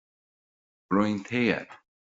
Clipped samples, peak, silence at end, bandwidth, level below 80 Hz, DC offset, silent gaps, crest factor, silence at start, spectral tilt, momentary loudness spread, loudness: under 0.1%; -8 dBFS; 0.35 s; 7.8 kHz; -66 dBFS; under 0.1%; none; 22 dB; 0.9 s; -5 dB/octave; 7 LU; -27 LUFS